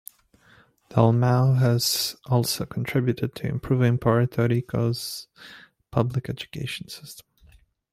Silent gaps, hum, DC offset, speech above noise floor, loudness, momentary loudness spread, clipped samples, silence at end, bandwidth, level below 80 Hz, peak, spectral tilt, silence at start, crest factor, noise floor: none; none; under 0.1%; 34 dB; -24 LUFS; 16 LU; under 0.1%; 0.75 s; 16 kHz; -54 dBFS; -4 dBFS; -5.5 dB/octave; 0.9 s; 20 dB; -58 dBFS